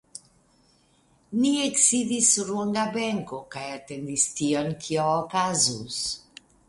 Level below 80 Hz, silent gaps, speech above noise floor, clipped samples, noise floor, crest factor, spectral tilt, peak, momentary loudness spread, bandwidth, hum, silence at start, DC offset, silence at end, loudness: -62 dBFS; none; 37 dB; under 0.1%; -63 dBFS; 20 dB; -2.5 dB/octave; -6 dBFS; 16 LU; 11.5 kHz; none; 0.15 s; under 0.1%; 0.5 s; -24 LUFS